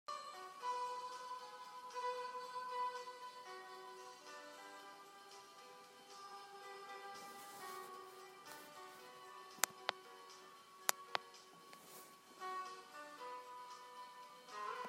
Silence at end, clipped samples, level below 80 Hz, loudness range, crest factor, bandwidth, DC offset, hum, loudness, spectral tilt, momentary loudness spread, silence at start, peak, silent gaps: 0 s; under 0.1%; under -90 dBFS; 9 LU; 40 dB; 16 kHz; under 0.1%; none; -49 LUFS; 0 dB/octave; 16 LU; 0.1 s; -10 dBFS; none